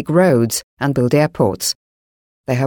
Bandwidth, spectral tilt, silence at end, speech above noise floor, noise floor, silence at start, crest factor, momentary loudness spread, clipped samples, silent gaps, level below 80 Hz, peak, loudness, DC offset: 19 kHz; -5.5 dB/octave; 0 s; over 74 dB; under -90 dBFS; 0 s; 14 dB; 10 LU; under 0.1%; 0.64-0.77 s, 1.75-2.44 s; -50 dBFS; -2 dBFS; -17 LUFS; under 0.1%